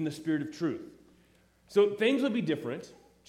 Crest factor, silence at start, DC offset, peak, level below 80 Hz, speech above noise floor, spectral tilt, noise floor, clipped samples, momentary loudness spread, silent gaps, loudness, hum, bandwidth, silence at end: 18 dB; 0 s; under 0.1%; -14 dBFS; -72 dBFS; 34 dB; -6 dB/octave; -64 dBFS; under 0.1%; 15 LU; none; -30 LUFS; none; 13 kHz; 0.35 s